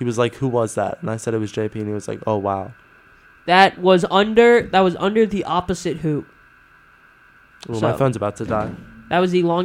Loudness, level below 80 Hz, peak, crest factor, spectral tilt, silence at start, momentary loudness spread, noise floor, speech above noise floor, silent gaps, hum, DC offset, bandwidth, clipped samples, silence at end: -19 LUFS; -50 dBFS; 0 dBFS; 20 dB; -6 dB/octave; 0 s; 13 LU; -51 dBFS; 32 dB; none; none; under 0.1%; 13.5 kHz; under 0.1%; 0 s